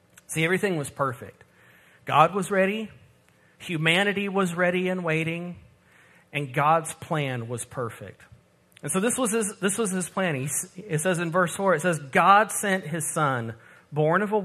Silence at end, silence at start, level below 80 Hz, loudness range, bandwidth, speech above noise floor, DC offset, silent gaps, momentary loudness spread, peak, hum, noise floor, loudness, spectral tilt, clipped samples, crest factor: 0 s; 0.3 s; -68 dBFS; 5 LU; 14 kHz; 35 dB; under 0.1%; none; 13 LU; -4 dBFS; none; -60 dBFS; -25 LUFS; -4.5 dB/octave; under 0.1%; 22 dB